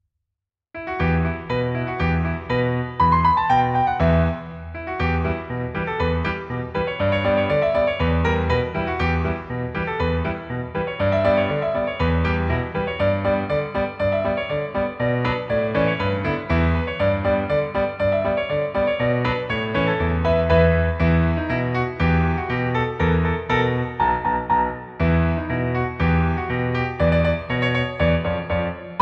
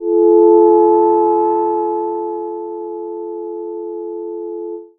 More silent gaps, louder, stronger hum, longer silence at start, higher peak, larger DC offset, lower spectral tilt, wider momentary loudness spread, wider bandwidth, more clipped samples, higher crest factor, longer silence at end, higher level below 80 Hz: neither; second, -21 LUFS vs -13 LUFS; neither; first, 0.75 s vs 0 s; second, -4 dBFS vs 0 dBFS; neither; second, -8.5 dB/octave vs -10.5 dB/octave; second, 7 LU vs 16 LU; first, 6.6 kHz vs 1.8 kHz; neither; about the same, 16 dB vs 14 dB; about the same, 0 s vs 0.1 s; first, -32 dBFS vs -66 dBFS